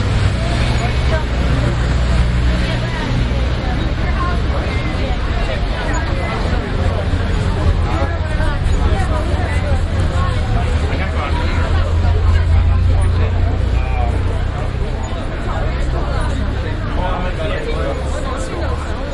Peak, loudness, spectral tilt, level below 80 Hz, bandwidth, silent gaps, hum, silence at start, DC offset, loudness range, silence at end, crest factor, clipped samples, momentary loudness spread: -2 dBFS; -18 LUFS; -6.5 dB/octave; -18 dBFS; 11 kHz; none; none; 0 s; under 0.1%; 4 LU; 0 s; 14 dB; under 0.1%; 5 LU